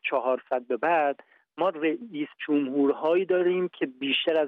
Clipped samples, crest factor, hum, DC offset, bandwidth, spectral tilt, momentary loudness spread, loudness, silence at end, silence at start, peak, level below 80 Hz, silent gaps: under 0.1%; 14 dB; none; under 0.1%; 4.5 kHz; -7 dB/octave; 7 LU; -26 LUFS; 0 s; 0.05 s; -12 dBFS; -80 dBFS; none